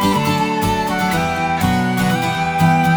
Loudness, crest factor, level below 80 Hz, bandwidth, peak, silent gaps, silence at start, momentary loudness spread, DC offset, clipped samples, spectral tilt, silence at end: -17 LUFS; 14 dB; -38 dBFS; over 20 kHz; -2 dBFS; none; 0 s; 3 LU; under 0.1%; under 0.1%; -5.5 dB/octave; 0 s